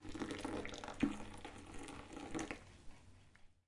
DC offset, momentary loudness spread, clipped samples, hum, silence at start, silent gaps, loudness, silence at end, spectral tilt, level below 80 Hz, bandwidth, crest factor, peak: under 0.1%; 22 LU; under 0.1%; none; 0 s; none; -46 LUFS; 0.15 s; -4.5 dB/octave; -60 dBFS; 11.5 kHz; 24 dB; -22 dBFS